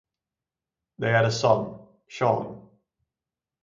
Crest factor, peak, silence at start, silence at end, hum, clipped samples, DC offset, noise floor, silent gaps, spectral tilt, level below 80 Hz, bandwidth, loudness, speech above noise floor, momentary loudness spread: 22 dB; -4 dBFS; 1 s; 1 s; none; under 0.1%; under 0.1%; -90 dBFS; none; -5.5 dB/octave; -64 dBFS; 7.6 kHz; -24 LUFS; 66 dB; 17 LU